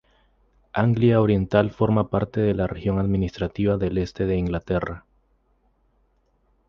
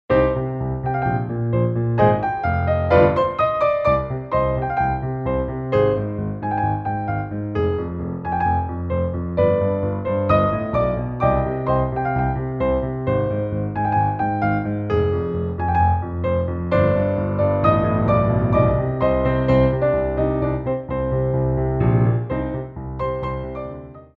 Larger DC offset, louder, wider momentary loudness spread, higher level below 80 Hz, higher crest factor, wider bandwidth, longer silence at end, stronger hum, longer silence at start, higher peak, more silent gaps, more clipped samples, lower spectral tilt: neither; about the same, -23 LUFS vs -21 LUFS; about the same, 8 LU vs 7 LU; second, -40 dBFS vs -34 dBFS; about the same, 20 dB vs 18 dB; first, 6.6 kHz vs 5.4 kHz; first, 1.7 s vs 0.1 s; neither; first, 0.75 s vs 0.1 s; about the same, -4 dBFS vs -2 dBFS; neither; neither; second, -9 dB/octave vs -10.5 dB/octave